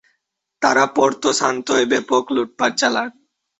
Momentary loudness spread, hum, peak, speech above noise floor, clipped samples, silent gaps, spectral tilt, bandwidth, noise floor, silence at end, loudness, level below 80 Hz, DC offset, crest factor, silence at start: 6 LU; none; -2 dBFS; 55 dB; under 0.1%; none; -2.5 dB/octave; 8.2 kHz; -73 dBFS; 0.5 s; -18 LUFS; -62 dBFS; under 0.1%; 18 dB; 0.6 s